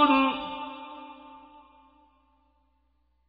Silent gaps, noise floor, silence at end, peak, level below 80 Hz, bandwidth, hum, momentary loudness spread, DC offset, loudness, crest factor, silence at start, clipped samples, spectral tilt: none; -71 dBFS; 1.9 s; -8 dBFS; -64 dBFS; 5 kHz; none; 26 LU; under 0.1%; -28 LUFS; 22 dB; 0 s; under 0.1%; -6 dB/octave